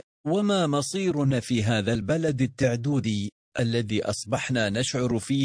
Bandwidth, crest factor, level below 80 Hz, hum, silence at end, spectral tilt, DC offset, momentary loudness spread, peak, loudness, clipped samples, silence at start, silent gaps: 10.5 kHz; 16 dB; -54 dBFS; none; 0 s; -5.5 dB/octave; under 0.1%; 4 LU; -10 dBFS; -26 LUFS; under 0.1%; 0.25 s; 3.32-3.52 s